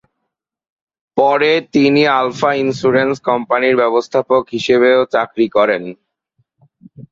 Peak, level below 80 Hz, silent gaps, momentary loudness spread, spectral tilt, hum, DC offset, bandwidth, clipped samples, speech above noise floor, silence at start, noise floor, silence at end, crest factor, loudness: -2 dBFS; -58 dBFS; none; 5 LU; -5.5 dB/octave; none; under 0.1%; 7.6 kHz; under 0.1%; 62 dB; 1.15 s; -76 dBFS; 0.1 s; 14 dB; -14 LUFS